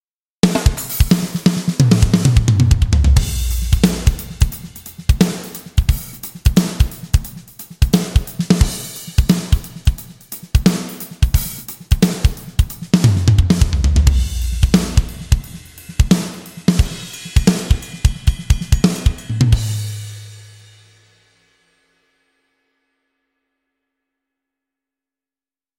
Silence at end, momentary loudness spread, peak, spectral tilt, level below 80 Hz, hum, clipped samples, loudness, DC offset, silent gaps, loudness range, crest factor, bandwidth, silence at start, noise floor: 5.35 s; 14 LU; 0 dBFS; -5.5 dB/octave; -20 dBFS; none; under 0.1%; -17 LUFS; under 0.1%; none; 4 LU; 16 dB; 17 kHz; 0.45 s; under -90 dBFS